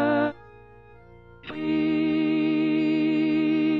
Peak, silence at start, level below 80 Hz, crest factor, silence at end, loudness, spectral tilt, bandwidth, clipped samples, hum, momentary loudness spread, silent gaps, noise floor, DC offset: -12 dBFS; 0 s; -58 dBFS; 12 dB; 0 s; -24 LUFS; -8.5 dB/octave; 5 kHz; under 0.1%; none; 8 LU; none; -50 dBFS; under 0.1%